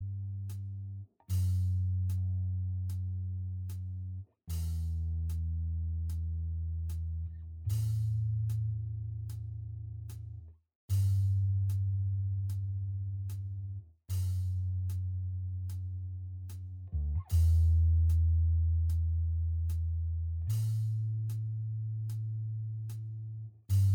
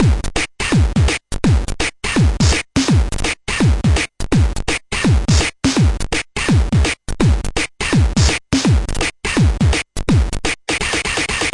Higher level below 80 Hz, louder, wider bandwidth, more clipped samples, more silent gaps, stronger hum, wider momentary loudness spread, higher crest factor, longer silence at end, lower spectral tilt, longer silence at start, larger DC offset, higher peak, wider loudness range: second, -40 dBFS vs -22 dBFS; second, -34 LUFS vs -17 LUFS; first, 15.5 kHz vs 11.5 kHz; neither; first, 10.75-10.88 s vs none; neither; first, 13 LU vs 5 LU; about the same, 12 dB vs 16 dB; about the same, 0 s vs 0 s; first, -7.5 dB/octave vs -4.5 dB/octave; about the same, 0 s vs 0 s; neither; second, -20 dBFS vs 0 dBFS; first, 7 LU vs 0 LU